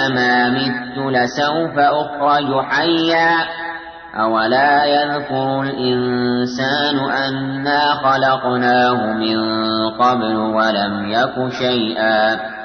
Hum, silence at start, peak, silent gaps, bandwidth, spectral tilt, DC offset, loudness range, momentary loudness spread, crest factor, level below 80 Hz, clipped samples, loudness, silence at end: none; 0 s; -4 dBFS; none; 6.6 kHz; -5.5 dB/octave; under 0.1%; 1 LU; 6 LU; 12 dB; -54 dBFS; under 0.1%; -16 LUFS; 0 s